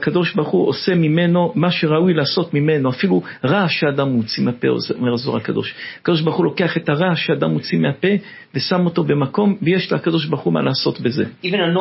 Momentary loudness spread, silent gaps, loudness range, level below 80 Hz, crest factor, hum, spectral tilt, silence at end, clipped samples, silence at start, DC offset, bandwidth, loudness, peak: 5 LU; none; 2 LU; -60 dBFS; 14 dB; none; -10 dB/octave; 0 s; under 0.1%; 0 s; under 0.1%; 5.8 kHz; -18 LUFS; -2 dBFS